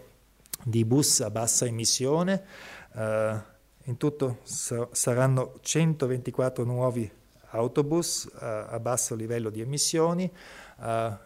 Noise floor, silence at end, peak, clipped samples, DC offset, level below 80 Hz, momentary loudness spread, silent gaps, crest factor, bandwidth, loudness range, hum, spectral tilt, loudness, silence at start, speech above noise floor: -57 dBFS; 0.05 s; -8 dBFS; under 0.1%; under 0.1%; -62 dBFS; 13 LU; none; 20 dB; 16 kHz; 3 LU; none; -4.5 dB/octave; -27 LUFS; 0.55 s; 30 dB